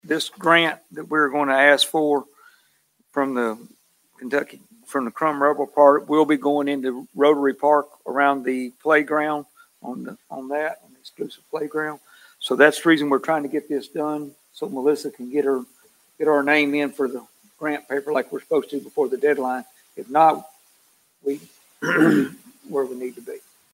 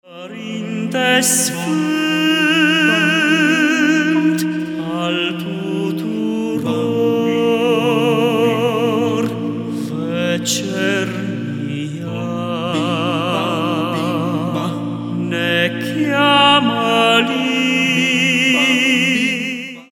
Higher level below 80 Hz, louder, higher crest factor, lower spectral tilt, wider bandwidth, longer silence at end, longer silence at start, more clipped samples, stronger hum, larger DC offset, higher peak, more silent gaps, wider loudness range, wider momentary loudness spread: second, -78 dBFS vs -64 dBFS; second, -21 LUFS vs -16 LUFS; first, 22 dB vs 16 dB; about the same, -4.5 dB/octave vs -4 dB/octave; second, 16 kHz vs 18 kHz; first, 0.35 s vs 0.05 s; about the same, 0.05 s vs 0.1 s; neither; neither; neither; about the same, 0 dBFS vs 0 dBFS; neither; about the same, 6 LU vs 6 LU; first, 18 LU vs 11 LU